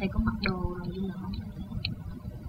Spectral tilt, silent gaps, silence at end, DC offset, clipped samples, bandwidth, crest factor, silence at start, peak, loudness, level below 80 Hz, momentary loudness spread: -8 dB/octave; none; 0 s; under 0.1%; under 0.1%; 16 kHz; 20 dB; 0 s; -12 dBFS; -34 LUFS; -38 dBFS; 9 LU